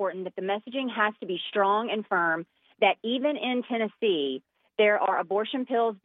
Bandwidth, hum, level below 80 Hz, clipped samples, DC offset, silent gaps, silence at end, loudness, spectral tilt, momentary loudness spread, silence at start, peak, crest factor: 4.1 kHz; none; -86 dBFS; under 0.1%; under 0.1%; none; 0.1 s; -27 LUFS; -8 dB/octave; 8 LU; 0 s; -8 dBFS; 18 dB